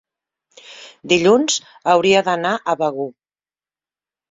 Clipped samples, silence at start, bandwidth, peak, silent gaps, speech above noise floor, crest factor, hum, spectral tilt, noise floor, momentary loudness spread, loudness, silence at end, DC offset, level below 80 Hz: under 0.1%; 0.7 s; 7.8 kHz; -2 dBFS; none; over 73 dB; 18 dB; none; -3.5 dB/octave; under -90 dBFS; 19 LU; -17 LUFS; 1.2 s; under 0.1%; -62 dBFS